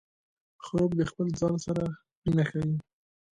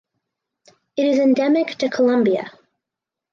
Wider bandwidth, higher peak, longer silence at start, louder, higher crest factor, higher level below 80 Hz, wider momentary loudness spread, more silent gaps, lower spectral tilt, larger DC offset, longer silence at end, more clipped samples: first, 10.5 kHz vs 7.2 kHz; second, -14 dBFS vs -8 dBFS; second, 0.6 s vs 0.95 s; second, -30 LUFS vs -18 LUFS; about the same, 16 dB vs 14 dB; first, -54 dBFS vs -72 dBFS; about the same, 8 LU vs 10 LU; first, 2.15-2.22 s vs none; first, -7.5 dB/octave vs -5.5 dB/octave; neither; second, 0.55 s vs 0.85 s; neither